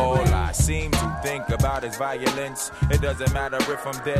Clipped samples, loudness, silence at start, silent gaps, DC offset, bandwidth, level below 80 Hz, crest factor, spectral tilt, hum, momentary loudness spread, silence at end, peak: under 0.1%; -24 LUFS; 0 s; none; under 0.1%; 15 kHz; -30 dBFS; 18 dB; -5 dB/octave; none; 6 LU; 0 s; -6 dBFS